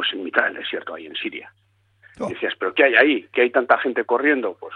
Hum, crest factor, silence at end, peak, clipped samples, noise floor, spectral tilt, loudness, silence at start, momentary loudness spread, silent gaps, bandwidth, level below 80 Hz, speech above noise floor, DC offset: none; 20 dB; 0 s; -2 dBFS; under 0.1%; -55 dBFS; -5 dB/octave; -20 LUFS; 0 s; 15 LU; none; 9.8 kHz; -68 dBFS; 34 dB; under 0.1%